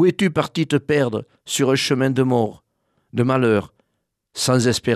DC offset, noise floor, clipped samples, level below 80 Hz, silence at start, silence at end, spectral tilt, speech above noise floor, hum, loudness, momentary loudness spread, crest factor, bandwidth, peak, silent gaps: under 0.1%; -74 dBFS; under 0.1%; -58 dBFS; 0 s; 0 s; -5 dB/octave; 56 dB; none; -20 LUFS; 8 LU; 16 dB; 14.5 kHz; -4 dBFS; none